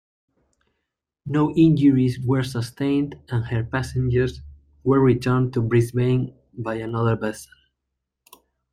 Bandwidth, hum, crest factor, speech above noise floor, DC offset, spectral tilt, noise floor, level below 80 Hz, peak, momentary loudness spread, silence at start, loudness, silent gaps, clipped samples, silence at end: 14 kHz; none; 16 dB; 60 dB; under 0.1%; -8 dB/octave; -80 dBFS; -46 dBFS; -6 dBFS; 12 LU; 1.25 s; -22 LUFS; none; under 0.1%; 1.3 s